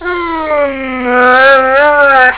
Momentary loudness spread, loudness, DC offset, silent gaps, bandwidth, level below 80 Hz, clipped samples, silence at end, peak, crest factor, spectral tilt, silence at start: 10 LU; -8 LUFS; under 0.1%; none; 4 kHz; -40 dBFS; under 0.1%; 0 s; 0 dBFS; 8 dB; -6.5 dB/octave; 0 s